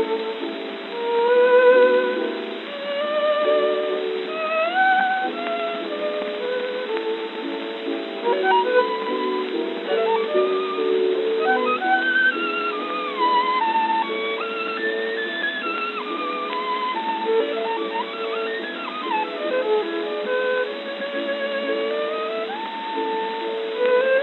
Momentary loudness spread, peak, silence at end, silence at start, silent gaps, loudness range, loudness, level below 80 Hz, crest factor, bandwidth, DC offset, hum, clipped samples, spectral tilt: 10 LU; -6 dBFS; 0 s; 0 s; none; 5 LU; -22 LUFS; -88 dBFS; 16 dB; 4.4 kHz; under 0.1%; none; under 0.1%; -5.5 dB/octave